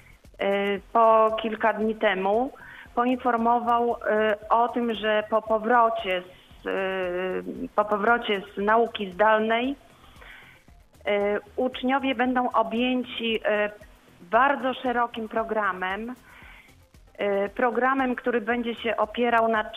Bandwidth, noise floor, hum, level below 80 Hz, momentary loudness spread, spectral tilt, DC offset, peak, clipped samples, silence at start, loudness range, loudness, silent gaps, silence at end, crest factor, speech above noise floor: 14 kHz; -54 dBFS; none; -56 dBFS; 9 LU; -6 dB/octave; under 0.1%; -6 dBFS; under 0.1%; 0.4 s; 4 LU; -25 LUFS; none; 0 s; 18 dB; 29 dB